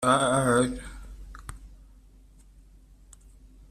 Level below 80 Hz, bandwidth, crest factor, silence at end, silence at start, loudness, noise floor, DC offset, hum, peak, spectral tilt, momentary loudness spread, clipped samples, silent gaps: -46 dBFS; 14.5 kHz; 22 dB; 1.95 s; 0 s; -24 LUFS; -54 dBFS; under 0.1%; none; -8 dBFS; -4.5 dB/octave; 24 LU; under 0.1%; none